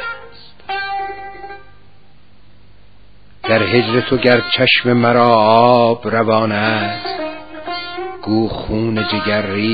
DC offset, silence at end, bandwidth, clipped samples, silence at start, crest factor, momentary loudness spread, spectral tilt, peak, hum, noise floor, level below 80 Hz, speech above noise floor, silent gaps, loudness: 1%; 0 s; 5.4 kHz; under 0.1%; 0 s; 16 dB; 17 LU; -9 dB/octave; 0 dBFS; 50 Hz at -50 dBFS; -49 dBFS; -44 dBFS; 36 dB; none; -15 LUFS